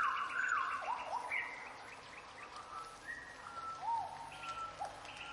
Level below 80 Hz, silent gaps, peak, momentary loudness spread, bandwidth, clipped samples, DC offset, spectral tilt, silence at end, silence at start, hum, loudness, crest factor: -72 dBFS; none; -24 dBFS; 14 LU; 11.5 kHz; under 0.1%; under 0.1%; -1.5 dB/octave; 0 s; 0 s; none; -42 LUFS; 18 dB